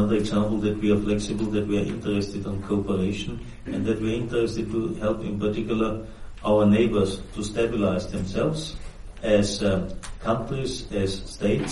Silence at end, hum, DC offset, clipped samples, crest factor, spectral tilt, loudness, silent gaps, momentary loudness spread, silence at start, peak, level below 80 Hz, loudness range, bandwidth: 0 s; none; under 0.1%; under 0.1%; 18 dB; -6.5 dB/octave; -25 LUFS; none; 11 LU; 0 s; -8 dBFS; -40 dBFS; 3 LU; 11.5 kHz